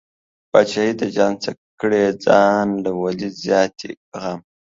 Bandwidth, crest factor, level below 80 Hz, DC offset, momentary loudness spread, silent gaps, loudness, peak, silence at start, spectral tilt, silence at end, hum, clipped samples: 7.8 kHz; 18 dB; -60 dBFS; under 0.1%; 14 LU; 1.58-1.78 s, 3.97-4.12 s; -19 LUFS; 0 dBFS; 0.55 s; -5.5 dB/octave; 0.4 s; none; under 0.1%